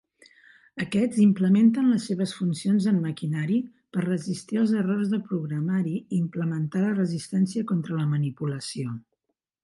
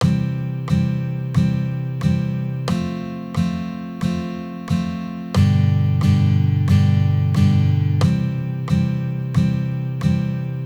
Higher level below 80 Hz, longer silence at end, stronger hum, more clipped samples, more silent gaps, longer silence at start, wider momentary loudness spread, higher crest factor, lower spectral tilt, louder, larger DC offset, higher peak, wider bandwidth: second, -68 dBFS vs -40 dBFS; first, 0.65 s vs 0 s; neither; neither; neither; first, 0.75 s vs 0 s; about the same, 11 LU vs 9 LU; about the same, 16 dB vs 14 dB; about the same, -7 dB/octave vs -8 dB/octave; second, -25 LUFS vs -20 LUFS; neither; second, -10 dBFS vs -4 dBFS; about the same, 11.5 kHz vs 10.5 kHz